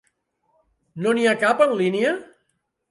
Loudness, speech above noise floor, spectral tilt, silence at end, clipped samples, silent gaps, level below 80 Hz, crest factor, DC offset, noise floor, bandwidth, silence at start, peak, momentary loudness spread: -20 LUFS; 53 dB; -5 dB/octave; 0.65 s; under 0.1%; none; -72 dBFS; 18 dB; under 0.1%; -73 dBFS; 11.5 kHz; 0.95 s; -6 dBFS; 11 LU